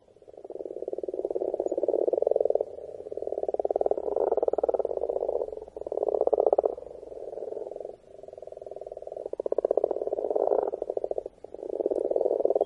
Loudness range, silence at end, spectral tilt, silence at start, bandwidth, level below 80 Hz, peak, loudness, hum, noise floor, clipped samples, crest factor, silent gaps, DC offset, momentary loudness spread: 5 LU; 0 s; -8 dB/octave; 0.25 s; 7.4 kHz; -64 dBFS; -6 dBFS; -29 LUFS; none; -49 dBFS; under 0.1%; 24 dB; none; under 0.1%; 16 LU